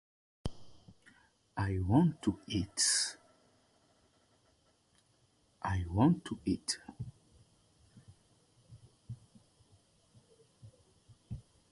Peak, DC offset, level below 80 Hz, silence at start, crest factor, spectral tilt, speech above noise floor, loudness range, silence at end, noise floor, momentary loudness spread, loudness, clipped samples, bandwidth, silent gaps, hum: -14 dBFS; under 0.1%; -54 dBFS; 0.45 s; 24 dB; -4.5 dB/octave; 39 dB; 14 LU; 0.3 s; -71 dBFS; 21 LU; -33 LUFS; under 0.1%; 11.5 kHz; none; none